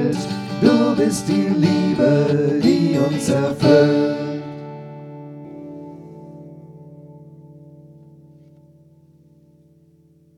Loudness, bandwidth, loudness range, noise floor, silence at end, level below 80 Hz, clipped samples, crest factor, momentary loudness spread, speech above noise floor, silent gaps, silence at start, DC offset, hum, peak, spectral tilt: -17 LUFS; 13.5 kHz; 22 LU; -54 dBFS; 2.7 s; -58 dBFS; under 0.1%; 20 dB; 23 LU; 38 dB; none; 0 s; under 0.1%; none; 0 dBFS; -6.5 dB/octave